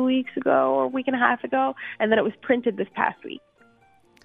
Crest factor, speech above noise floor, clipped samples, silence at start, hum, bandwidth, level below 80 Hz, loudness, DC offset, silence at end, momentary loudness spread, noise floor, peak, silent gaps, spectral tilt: 20 dB; 35 dB; under 0.1%; 0 s; none; 3.9 kHz; -68 dBFS; -23 LUFS; under 0.1%; 0.85 s; 6 LU; -59 dBFS; -4 dBFS; none; -7.5 dB/octave